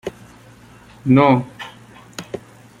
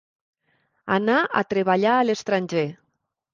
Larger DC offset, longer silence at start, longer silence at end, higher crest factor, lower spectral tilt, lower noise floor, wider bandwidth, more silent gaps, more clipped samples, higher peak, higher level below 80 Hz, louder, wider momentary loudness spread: neither; second, 0.05 s vs 0.85 s; second, 0.45 s vs 0.6 s; about the same, 20 dB vs 18 dB; first, -7.5 dB/octave vs -5.5 dB/octave; second, -45 dBFS vs -75 dBFS; first, 13 kHz vs 7.4 kHz; neither; neither; first, -2 dBFS vs -6 dBFS; first, -54 dBFS vs -68 dBFS; first, -16 LUFS vs -22 LUFS; first, 22 LU vs 7 LU